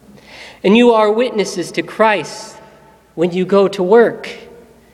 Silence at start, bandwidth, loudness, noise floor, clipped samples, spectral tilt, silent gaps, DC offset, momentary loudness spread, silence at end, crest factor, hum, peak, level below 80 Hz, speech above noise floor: 0.3 s; 12.5 kHz; -14 LUFS; -45 dBFS; under 0.1%; -5.5 dB/octave; none; under 0.1%; 23 LU; 0.5 s; 16 dB; none; 0 dBFS; -56 dBFS; 32 dB